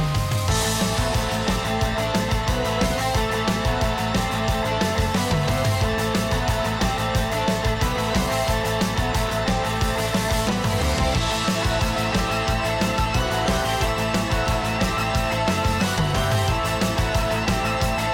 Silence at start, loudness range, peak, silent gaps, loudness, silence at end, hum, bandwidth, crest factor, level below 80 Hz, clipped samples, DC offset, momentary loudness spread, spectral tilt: 0 s; 1 LU; -8 dBFS; none; -22 LUFS; 0 s; none; 17 kHz; 14 dB; -30 dBFS; under 0.1%; under 0.1%; 2 LU; -4.5 dB/octave